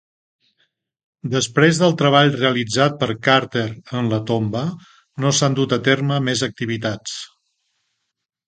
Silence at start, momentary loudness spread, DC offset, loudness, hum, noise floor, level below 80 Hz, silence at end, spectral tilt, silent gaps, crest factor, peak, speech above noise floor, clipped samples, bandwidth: 1.25 s; 14 LU; under 0.1%; -18 LUFS; none; -74 dBFS; -58 dBFS; 1.2 s; -4.5 dB/octave; none; 20 dB; 0 dBFS; 55 dB; under 0.1%; 9.4 kHz